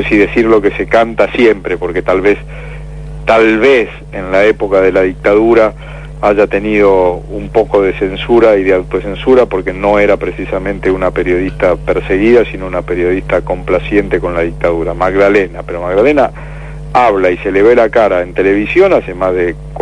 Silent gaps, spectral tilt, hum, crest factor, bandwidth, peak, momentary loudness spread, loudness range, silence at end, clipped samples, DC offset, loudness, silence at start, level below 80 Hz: none; -7 dB/octave; none; 10 dB; 10.5 kHz; 0 dBFS; 9 LU; 2 LU; 0 s; 1%; 0.4%; -11 LUFS; 0 s; -28 dBFS